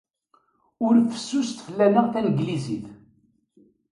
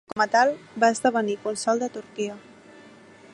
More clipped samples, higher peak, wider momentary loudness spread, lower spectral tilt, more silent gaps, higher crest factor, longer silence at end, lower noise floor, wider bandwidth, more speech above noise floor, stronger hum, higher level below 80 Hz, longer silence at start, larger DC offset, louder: neither; about the same, -6 dBFS vs -6 dBFS; about the same, 12 LU vs 12 LU; first, -6.5 dB/octave vs -3.5 dB/octave; neither; about the same, 18 dB vs 20 dB; first, 0.95 s vs 0.45 s; first, -65 dBFS vs -49 dBFS; about the same, 11 kHz vs 11.5 kHz; first, 43 dB vs 25 dB; neither; first, -64 dBFS vs -72 dBFS; first, 0.8 s vs 0.1 s; neither; about the same, -23 LUFS vs -24 LUFS